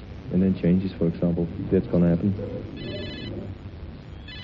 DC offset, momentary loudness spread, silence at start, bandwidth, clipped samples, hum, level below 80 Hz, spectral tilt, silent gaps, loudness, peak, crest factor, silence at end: under 0.1%; 18 LU; 0 s; 5.4 kHz; under 0.1%; none; -42 dBFS; -10.5 dB/octave; none; -25 LUFS; -10 dBFS; 16 dB; 0 s